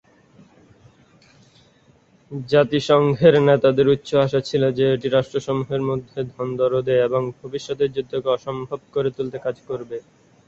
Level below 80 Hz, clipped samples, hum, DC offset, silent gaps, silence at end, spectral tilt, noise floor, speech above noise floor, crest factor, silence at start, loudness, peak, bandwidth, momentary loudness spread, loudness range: -56 dBFS; under 0.1%; none; under 0.1%; none; 0.45 s; -7 dB/octave; -56 dBFS; 36 dB; 18 dB; 2.3 s; -20 LUFS; -2 dBFS; 7.8 kHz; 15 LU; 6 LU